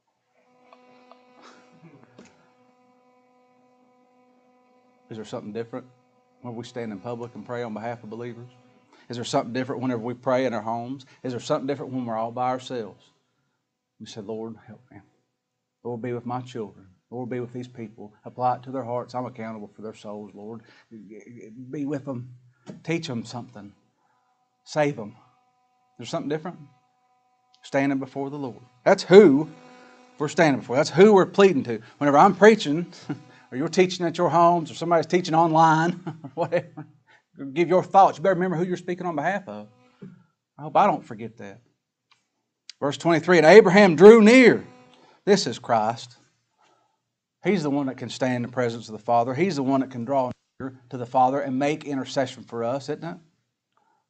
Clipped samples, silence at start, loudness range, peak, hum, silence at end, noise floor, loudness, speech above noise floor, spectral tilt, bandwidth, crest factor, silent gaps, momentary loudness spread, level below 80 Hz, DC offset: under 0.1%; 5.1 s; 19 LU; 0 dBFS; none; 0.95 s; -80 dBFS; -21 LUFS; 58 dB; -6 dB/octave; 8.8 kHz; 24 dB; none; 23 LU; -72 dBFS; under 0.1%